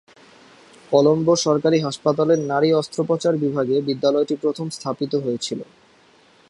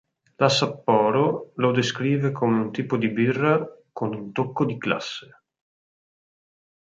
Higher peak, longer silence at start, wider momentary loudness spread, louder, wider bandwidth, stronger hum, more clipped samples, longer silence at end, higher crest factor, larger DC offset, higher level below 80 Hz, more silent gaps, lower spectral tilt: about the same, -2 dBFS vs -4 dBFS; first, 0.9 s vs 0.4 s; about the same, 9 LU vs 10 LU; first, -20 LUFS vs -23 LUFS; first, 11.5 kHz vs 9.2 kHz; neither; neither; second, 0.85 s vs 1.7 s; about the same, 18 dB vs 22 dB; neither; about the same, -64 dBFS vs -66 dBFS; neither; about the same, -5.5 dB/octave vs -6 dB/octave